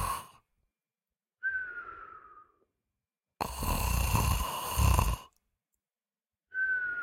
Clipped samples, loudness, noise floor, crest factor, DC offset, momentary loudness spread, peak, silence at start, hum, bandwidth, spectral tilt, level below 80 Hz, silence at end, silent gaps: under 0.1%; -32 LUFS; under -90 dBFS; 22 dB; under 0.1%; 16 LU; -12 dBFS; 0 s; none; 16.5 kHz; -4 dB/octave; -38 dBFS; 0 s; none